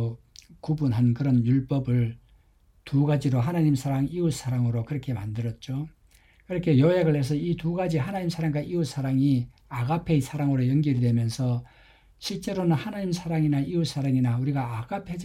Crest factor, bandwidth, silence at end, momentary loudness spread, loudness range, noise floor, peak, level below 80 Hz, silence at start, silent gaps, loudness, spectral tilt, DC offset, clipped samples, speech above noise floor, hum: 16 dB; 13.5 kHz; 0 s; 9 LU; 2 LU; -60 dBFS; -10 dBFS; -52 dBFS; 0 s; none; -26 LUFS; -7.5 dB/octave; under 0.1%; under 0.1%; 35 dB; none